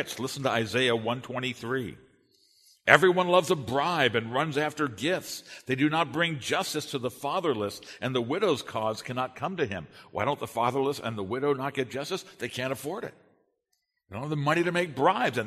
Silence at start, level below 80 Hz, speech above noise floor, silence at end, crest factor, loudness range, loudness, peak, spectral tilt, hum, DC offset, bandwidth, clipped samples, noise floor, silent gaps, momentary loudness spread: 0 s; -68 dBFS; 51 dB; 0 s; 28 dB; 7 LU; -28 LUFS; 0 dBFS; -4.5 dB/octave; none; under 0.1%; 13.5 kHz; under 0.1%; -79 dBFS; none; 10 LU